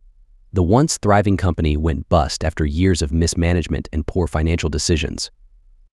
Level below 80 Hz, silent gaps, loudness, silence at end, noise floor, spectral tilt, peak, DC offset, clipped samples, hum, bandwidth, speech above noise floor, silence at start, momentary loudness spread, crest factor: -28 dBFS; none; -19 LUFS; 0.65 s; -49 dBFS; -5.5 dB/octave; -2 dBFS; under 0.1%; under 0.1%; none; 12 kHz; 31 dB; 0.55 s; 8 LU; 18 dB